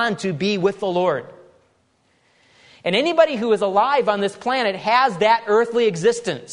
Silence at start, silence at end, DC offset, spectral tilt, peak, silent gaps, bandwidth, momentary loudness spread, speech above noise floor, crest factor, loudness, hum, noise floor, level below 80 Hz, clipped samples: 0 s; 0 s; under 0.1%; -4.5 dB/octave; -2 dBFS; none; 11 kHz; 6 LU; 44 dB; 18 dB; -19 LUFS; none; -62 dBFS; -66 dBFS; under 0.1%